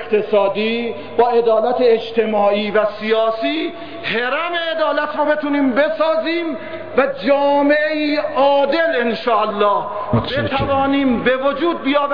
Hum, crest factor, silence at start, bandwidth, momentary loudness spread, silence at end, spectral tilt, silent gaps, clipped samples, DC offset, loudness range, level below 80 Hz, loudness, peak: none; 12 dB; 0 s; 5.2 kHz; 6 LU; 0 s; -8 dB/octave; none; under 0.1%; 1%; 2 LU; -48 dBFS; -17 LUFS; -4 dBFS